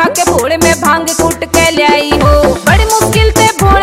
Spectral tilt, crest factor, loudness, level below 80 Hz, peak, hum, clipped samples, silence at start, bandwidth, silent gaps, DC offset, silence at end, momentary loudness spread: -4 dB/octave; 8 dB; -9 LUFS; -18 dBFS; 0 dBFS; none; 0.5%; 0 s; 16.5 kHz; none; 0.2%; 0 s; 3 LU